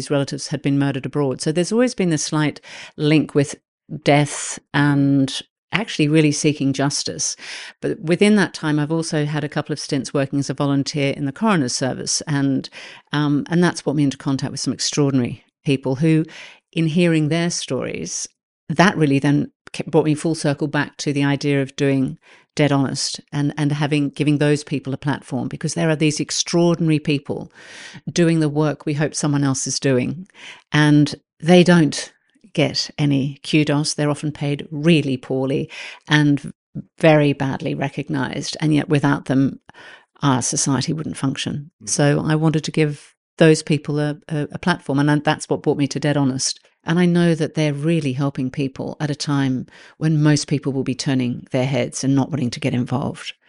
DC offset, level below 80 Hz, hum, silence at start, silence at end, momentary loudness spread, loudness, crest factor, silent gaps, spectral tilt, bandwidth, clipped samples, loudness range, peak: under 0.1%; -58 dBFS; none; 0 s; 0.15 s; 10 LU; -20 LUFS; 18 dB; 3.68-3.78 s, 5.50-5.68 s, 18.43-18.67 s, 19.55-19.65 s, 31.33-31.37 s, 36.55-36.73 s, 41.73-41.79 s, 43.17-43.37 s; -5 dB/octave; 11 kHz; under 0.1%; 3 LU; 0 dBFS